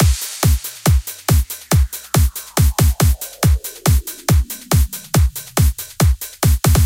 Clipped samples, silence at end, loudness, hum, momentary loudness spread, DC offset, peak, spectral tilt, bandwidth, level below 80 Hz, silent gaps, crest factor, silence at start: under 0.1%; 0 s; -17 LUFS; none; 3 LU; under 0.1%; 0 dBFS; -5 dB/octave; 17.5 kHz; -20 dBFS; none; 16 dB; 0 s